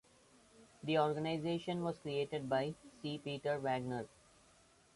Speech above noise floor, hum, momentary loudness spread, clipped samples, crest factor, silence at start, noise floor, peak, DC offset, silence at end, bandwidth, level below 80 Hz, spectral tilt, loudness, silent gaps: 30 dB; none; 10 LU; under 0.1%; 20 dB; 0.6 s; -68 dBFS; -20 dBFS; under 0.1%; 0.9 s; 11.5 kHz; -74 dBFS; -6.5 dB/octave; -39 LUFS; none